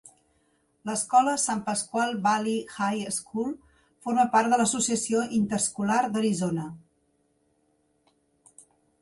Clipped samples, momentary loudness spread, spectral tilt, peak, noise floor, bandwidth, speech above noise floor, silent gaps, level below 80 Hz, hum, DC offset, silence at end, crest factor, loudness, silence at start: under 0.1%; 10 LU; -4 dB/octave; -10 dBFS; -70 dBFS; 11.5 kHz; 44 dB; none; -66 dBFS; none; under 0.1%; 2.25 s; 18 dB; -26 LUFS; 0.05 s